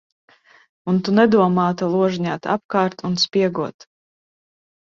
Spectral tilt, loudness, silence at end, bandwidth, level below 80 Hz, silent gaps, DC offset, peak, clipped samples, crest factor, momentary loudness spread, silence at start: -6 dB/octave; -19 LUFS; 1.25 s; 7.4 kHz; -60 dBFS; 2.65-2.69 s; under 0.1%; -2 dBFS; under 0.1%; 18 dB; 9 LU; 0.85 s